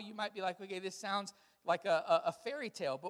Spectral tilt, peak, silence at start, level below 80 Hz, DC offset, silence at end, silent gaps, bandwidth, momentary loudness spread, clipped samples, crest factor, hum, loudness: -3.5 dB/octave; -18 dBFS; 0 s; -88 dBFS; under 0.1%; 0 s; none; 14 kHz; 11 LU; under 0.1%; 18 dB; none; -37 LUFS